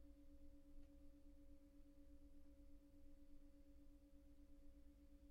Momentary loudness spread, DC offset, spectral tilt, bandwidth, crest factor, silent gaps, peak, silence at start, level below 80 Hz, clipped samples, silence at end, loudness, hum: 1 LU; under 0.1%; -8 dB/octave; 6.4 kHz; 12 dB; none; -50 dBFS; 0 s; -66 dBFS; under 0.1%; 0 s; -70 LUFS; none